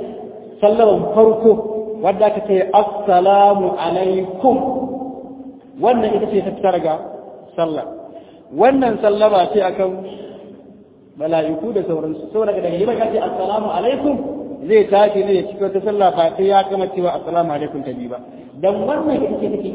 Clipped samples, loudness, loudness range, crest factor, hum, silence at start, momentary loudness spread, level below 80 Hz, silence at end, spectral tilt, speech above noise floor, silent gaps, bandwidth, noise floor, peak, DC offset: under 0.1%; -16 LUFS; 6 LU; 16 dB; none; 0 s; 17 LU; -52 dBFS; 0 s; -10 dB/octave; 28 dB; none; 4 kHz; -44 dBFS; 0 dBFS; under 0.1%